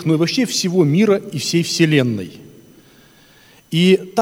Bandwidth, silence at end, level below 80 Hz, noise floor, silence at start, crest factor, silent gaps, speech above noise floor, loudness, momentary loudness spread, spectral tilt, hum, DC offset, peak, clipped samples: over 20 kHz; 0 s; -62 dBFS; -49 dBFS; 0 s; 18 dB; none; 33 dB; -16 LUFS; 8 LU; -5 dB/octave; none; under 0.1%; 0 dBFS; under 0.1%